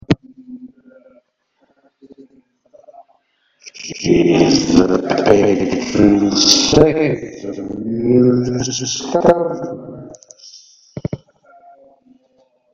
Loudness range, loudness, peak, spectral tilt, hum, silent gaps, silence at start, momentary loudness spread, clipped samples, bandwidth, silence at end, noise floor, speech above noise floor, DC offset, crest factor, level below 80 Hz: 10 LU; -14 LUFS; 0 dBFS; -4.5 dB/octave; none; none; 0.1 s; 20 LU; 0.1%; 8.2 kHz; 1.55 s; -63 dBFS; 49 dB; under 0.1%; 18 dB; -44 dBFS